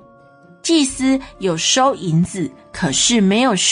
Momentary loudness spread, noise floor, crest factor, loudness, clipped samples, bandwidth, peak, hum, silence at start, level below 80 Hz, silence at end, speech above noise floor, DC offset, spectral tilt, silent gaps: 10 LU; -46 dBFS; 14 dB; -16 LUFS; under 0.1%; 10.5 kHz; -2 dBFS; none; 0.65 s; -46 dBFS; 0 s; 30 dB; under 0.1%; -3.5 dB/octave; none